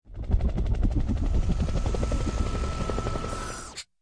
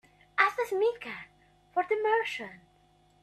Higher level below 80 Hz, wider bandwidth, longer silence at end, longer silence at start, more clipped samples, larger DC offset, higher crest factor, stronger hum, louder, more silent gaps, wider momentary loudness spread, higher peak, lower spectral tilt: first, -28 dBFS vs -72 dBFS; second, 10.5 kHz vs 14 kHz; second, 0.2 s vs 0.65 s; second, 0.05 s vs 0.35 s; neither; neither; second, 14 dB vs 24 dB; neither; about the same, -30 LUFS vs -29 LUFS; neither; second, 6 LU vs 15 LU; second, -12 dBFS vs -8 dBFS; first, -6 dB/octave vs -3 dB/octave